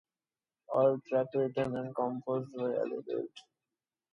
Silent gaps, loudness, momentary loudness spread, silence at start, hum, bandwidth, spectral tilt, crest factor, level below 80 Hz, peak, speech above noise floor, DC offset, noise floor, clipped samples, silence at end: none; -33 LUFS; 9 LU; 0.7 s; none; 7.2 kHz; -8.5 dB/octave; 18 dB; -74 dBFS; -16 dBFS; over 57 dB; under 0.1%; under -90 dBFS; under 0.1%; 0.7 s